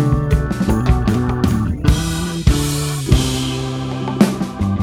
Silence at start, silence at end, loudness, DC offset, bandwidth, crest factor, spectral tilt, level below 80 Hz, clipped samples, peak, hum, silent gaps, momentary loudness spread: 0 s; 0 s; -18 LUFS; under 0.1%; 16.5 kHz; 16 dB; -6 dB/octave; -22 dBFS; under 0.1%; 0 dBFS; none; none; 5 LU